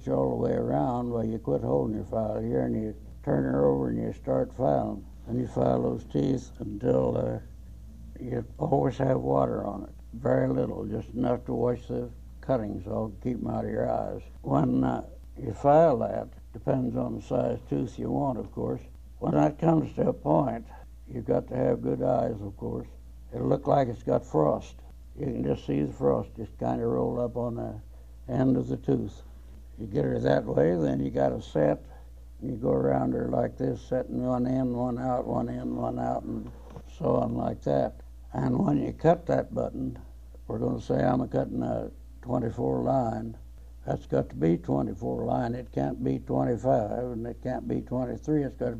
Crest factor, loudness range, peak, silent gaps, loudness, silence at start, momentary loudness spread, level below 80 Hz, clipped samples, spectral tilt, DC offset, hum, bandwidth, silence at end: 20 dB; 3 LU; -8 dBFS; none; -29 LUFS; 0 s; 13 LU; -46 dBFS; under 0.1%; -9 dB/octave; 0.2%; none; 8.6 kHz; 0 s